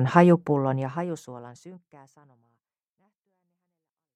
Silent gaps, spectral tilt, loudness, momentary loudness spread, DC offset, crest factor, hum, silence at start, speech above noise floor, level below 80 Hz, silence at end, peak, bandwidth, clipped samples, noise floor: none; -8.5 dB/octave; -23 LUFS; 24 LU; under 0.1%; 24 dB; none; 0 s; 61 dB; -72 dBFS; 2.4 s; -2 dBFS; 8.6 kHz; under 0.1%; -85 dBFS